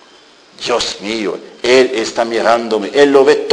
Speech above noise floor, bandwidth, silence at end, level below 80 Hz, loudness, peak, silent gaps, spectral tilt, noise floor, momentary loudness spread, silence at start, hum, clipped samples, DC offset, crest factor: 31 dB; 10.5 kHz; 0 s; -52 dBFS; -13 LUFS; 0 dBFS; none; -3 dB/octave; -44 dBFS; 10 LU; 0.6 s; none; 0.1%; under 0.1%; 14 dB